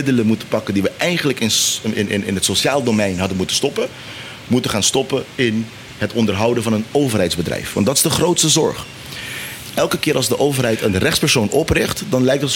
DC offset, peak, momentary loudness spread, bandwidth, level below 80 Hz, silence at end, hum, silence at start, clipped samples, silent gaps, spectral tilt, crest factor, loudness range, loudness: under 0.1%; -2 dBFS; 11 LU; 17 kHz; -44 dBFS; 0 s; none; 0 s; under 0.1%; none; -3.5 dB/octave; 16 dB; 2 LU; -17 LUFS